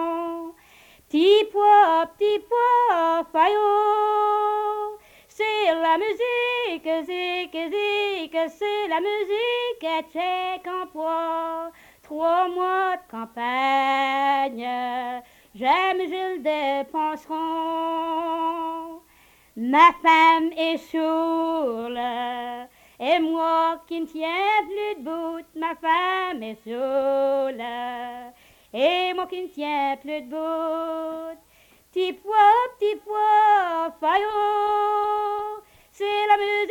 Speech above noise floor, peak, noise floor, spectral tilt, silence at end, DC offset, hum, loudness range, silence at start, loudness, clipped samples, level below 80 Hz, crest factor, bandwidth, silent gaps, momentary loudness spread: 33 dB; -4 dBFS; -57 dBFS; -3.5 dB/octave; 0 s; under 0.1%; none; 6 LU; 0 s; -23 LUFS; under 0.1%; -66 dBFS; 20 dB; 19 kHz; none; 13 LU